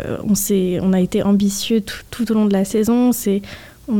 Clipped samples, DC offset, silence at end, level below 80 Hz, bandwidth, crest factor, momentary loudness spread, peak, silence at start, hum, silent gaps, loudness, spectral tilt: under 0.1%; 0.3%; 0 s; -44 dBFS; 18 kHz; 12 dB; 8 LU; -6 dBFS; 0 s; none; none; -17 LUFS; -5.5 dB/octave